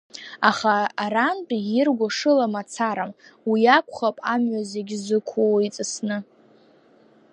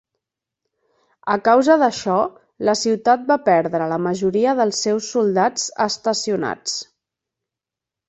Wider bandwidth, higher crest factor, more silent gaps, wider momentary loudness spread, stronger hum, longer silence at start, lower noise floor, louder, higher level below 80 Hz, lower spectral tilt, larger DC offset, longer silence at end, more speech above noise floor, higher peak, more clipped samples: first, 10.5 kHz vs 8.2 kHz; about the same, 20 dB vs 18 dB; neither; first, 11 LU vs 8 LU; neither; second, 0.15 s vs 1.25 s; second, -55 dBFS vs -87 dBFS; second, -22 LUFS vs -19 LUFS; second, -76 dBFS vs -64 dBFS; about the same, -4 dB/octave vs -4 dB/octave; neither; second, 1.1 s vs 1.25 s; second, 33 dB vs 69 dB; about the same, -2 dBFS vs -2 dBFS; neither